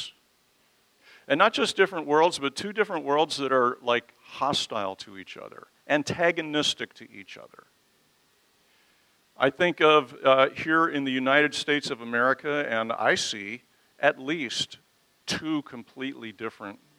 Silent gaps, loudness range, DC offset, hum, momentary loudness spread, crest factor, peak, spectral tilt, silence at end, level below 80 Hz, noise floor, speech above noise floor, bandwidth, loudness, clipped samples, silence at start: none; 8 LU; under 0.1%; none; 19 LU; 24 dB; -4 dBFS; -3.5 dB/octave; 0.25 s; -72 dBFS; -66 dBFS; 40 dB; 15.5 kHz; -25 LUFS; under 0.1%; 0 s